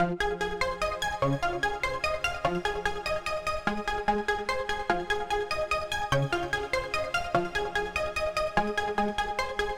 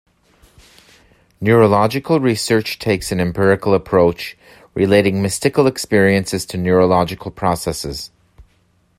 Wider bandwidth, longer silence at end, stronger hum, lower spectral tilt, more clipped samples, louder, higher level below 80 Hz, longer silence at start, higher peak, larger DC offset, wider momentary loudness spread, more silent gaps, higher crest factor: first, 18.5 kHz vs 16 kHz; second, 0 s vs 0.55 s; neither; about the same, -4.5 dB/octave vs -5.5 dB/octave; neither; second, -29 LUFS vs -16 LUFS; about the same, -44 dBFS vs -46 dBFS; second, 0 s vs 1.4 s; second, -10 dBFS vs 0 dBFS; first, 0.4% vs under 0.1%; second, 2 LU vs 10 LU; neither; about the same, 20 dB vs 16 dB